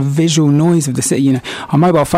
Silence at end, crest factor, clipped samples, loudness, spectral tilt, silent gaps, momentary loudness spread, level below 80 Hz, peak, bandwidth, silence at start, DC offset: 0 s; 10 dB; under 0.1%; -13 LUFS; -5.5 dB/octave; none; 5 LU; -46 dBFS; -2 dBFS; 15.5 kHz; 0 s; under 0.1%